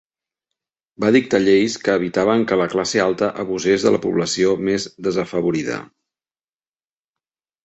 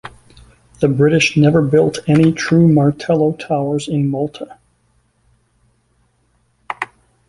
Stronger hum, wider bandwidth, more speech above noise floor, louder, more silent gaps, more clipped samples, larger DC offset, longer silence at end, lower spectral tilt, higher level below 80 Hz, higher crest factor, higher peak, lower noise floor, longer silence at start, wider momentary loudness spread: neither; second, 8.2 kHz vs 11.5 kHz; first, over 72 dB vs 47 dB; second, -19 LUFS vs -15 LUFS; neither; neither; neither; first, 1.8 s vs 0.45 s; second, -5 dB/octave vs -6.5 dB/octave; second, -56 dBFS vs -48 dBFS; about the same, 18 dB vs 16 dB; about the same, -2 dBFS vs -2 dBFS; first, under -90 dBFS vs -60 dBFS; first, 1 s vs 0.05 s; second, 7 LU vs 14 LU